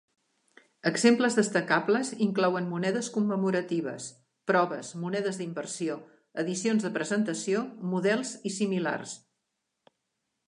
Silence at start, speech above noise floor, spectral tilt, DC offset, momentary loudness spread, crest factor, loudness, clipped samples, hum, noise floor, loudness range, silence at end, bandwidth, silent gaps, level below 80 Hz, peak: 0.85 s; 54 dB; -5 dB/octave; under 0.1%; 11 LU; 20 dB; -28 LUFS; under 0.1%; none; -82 dBFS; 5 LU; 1.3 s; 11 kHz; none; -80 dBFS; -10 dBFS